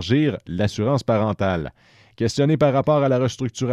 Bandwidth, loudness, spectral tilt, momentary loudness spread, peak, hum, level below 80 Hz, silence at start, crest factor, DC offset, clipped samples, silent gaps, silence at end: 11.5 kHz; -21 LUFS; -6.5 dB/octave; 8 LU; -6 dBFS; none; -48 dBFS; 0 s; 14 dB; under 0.1%; under 0.1%; none; 0 s